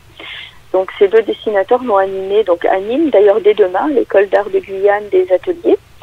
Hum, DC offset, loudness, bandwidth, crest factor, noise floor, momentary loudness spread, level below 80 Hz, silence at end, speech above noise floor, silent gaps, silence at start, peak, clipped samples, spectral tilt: none; under 0.1%; -13 LUFS; 5.6 kHz; 14 dB; -32 dBFS; 8 LU; -52 dBFS; 0.25 s; 19 dB; none; 0.2 s; 0 dBFS; under 0.1%; -6 dB/octave